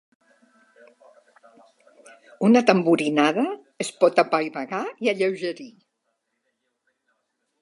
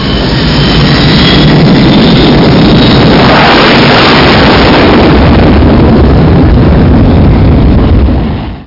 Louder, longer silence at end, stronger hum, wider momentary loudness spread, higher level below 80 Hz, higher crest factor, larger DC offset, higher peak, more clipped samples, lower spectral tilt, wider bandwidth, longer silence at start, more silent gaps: second, -22 LUFS vs -4 LUFS; first, 1.9 s vs 0.05 s; neither; first, 13 LU vs 4 LU; second, -78 dBFS vs -12 dBFS; first, 24 dB vs 4 dB; neither; about the same, -2 dBFS vs 0 dBFS; second, under 0.1% vs 2%; second, -5.5 dB/octave vs -7.5 dB/octave; first, 11.5 kHz vs 6 kHz; first, 2.4 s vs 0 s; neither